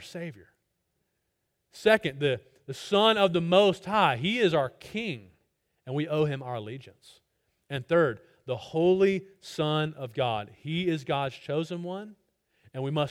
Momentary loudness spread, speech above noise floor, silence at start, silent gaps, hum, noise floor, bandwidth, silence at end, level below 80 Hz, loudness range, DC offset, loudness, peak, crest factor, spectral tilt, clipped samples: 17 LU; 52 dB; 0 s; none; none; -79 dBFS; 15.5 kHz; 0 s; -66 dBFS; 7 LU; under 0.1%; -27 LUFS; -8 dBFS; 22 dB; -6 dB/octave; under 0.1%